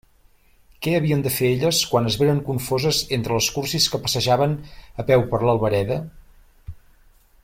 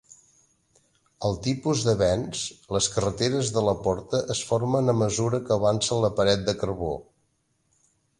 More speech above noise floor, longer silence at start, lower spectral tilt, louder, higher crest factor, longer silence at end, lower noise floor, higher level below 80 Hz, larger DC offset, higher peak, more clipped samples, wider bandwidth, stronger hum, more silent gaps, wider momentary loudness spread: second, 35 dB vs 46 dB; second, 0.8 s vs 1.2 s; about the same, -4.5 dB/octave vs -5 dB/octave; first, -21 LUFS vs -25 LUFS; about the same, 18 dB vs 18 dB; second, 0.65 s vs 1.2 s; second, -55 dBFS vs -71 dBFS; about the same, -46 dBFS vs -48 dBFS; neither; first, -4 dBFS vs -8 dBFS; neither; first, 16.5 kHz vs 11.5 kHz; neither; neither; about the same, 9 LU vs 7 LU